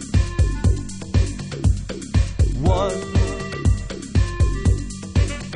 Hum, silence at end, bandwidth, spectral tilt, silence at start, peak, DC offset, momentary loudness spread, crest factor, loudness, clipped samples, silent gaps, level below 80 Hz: none; 0 s; 10.5 kHz; -6.5 dB/octave; 0 s; -6 dBFS; under 0.1%; 5 LU; 12 dB; -22 LUFS; under 0.1%; none; -24 dBFS